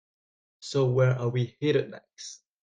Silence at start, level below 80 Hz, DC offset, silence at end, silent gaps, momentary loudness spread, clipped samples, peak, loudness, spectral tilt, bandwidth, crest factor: 0.6 s; -66 dBFS; under 0.1%; 0.25 s; none; 19 LU; under 0.1%; -12 dBFS; -26 LUFS; -6.5 dB/octave; 9 kHz; 16 dB